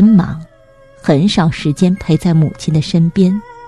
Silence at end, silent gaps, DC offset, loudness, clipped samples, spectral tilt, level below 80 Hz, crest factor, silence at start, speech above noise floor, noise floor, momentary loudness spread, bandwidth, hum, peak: 0 s; none; under 0.1%; -13 LUFS; under 0.1%; -7 dB/octave; -40 dBFS; 12 dB; 0 s; 31 dB; -44 dBFS; 6 LU; 11.5 kHz; none; 0 dBFS